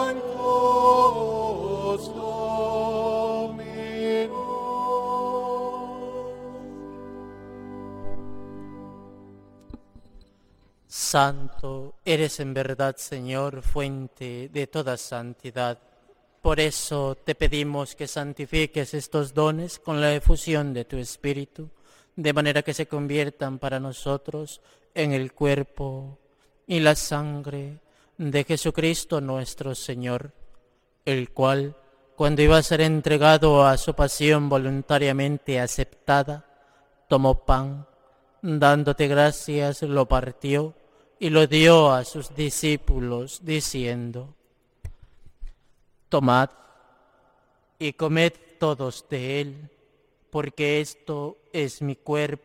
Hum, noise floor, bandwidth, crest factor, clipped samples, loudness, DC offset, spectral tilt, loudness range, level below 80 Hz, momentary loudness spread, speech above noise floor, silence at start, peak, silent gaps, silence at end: none; -64 dBFS; 16.5 kHz; 20 dB; under 0.1%; -24 LUFS; under 0.1%; -5 dB/octave; 10 LU; -36 dBFS; 18 LU; 41 dB; 0 s; -4 dBFS; none; 0.05 s